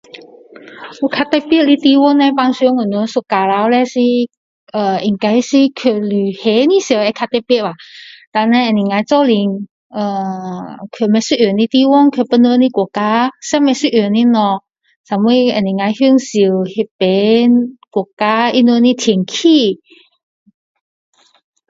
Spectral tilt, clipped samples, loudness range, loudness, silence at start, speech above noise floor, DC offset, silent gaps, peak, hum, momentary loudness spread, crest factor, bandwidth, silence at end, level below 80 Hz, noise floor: -5.5 dB/octave; under 0.1%; 3 LU; -13 LUFS; 0.15 s; 25 dB; under 0.1%; 4.37-4.67 s, 8.27-8.32 s, 9.71-9.90 s, 14.96-15.04 s, 16.91-16.99 s, 18.13-18.17 s; 0 dBFS; none; 11 LU; 14 dB; 7.8 kHz; 1.95 s; -60 dBFS; -38 dBFS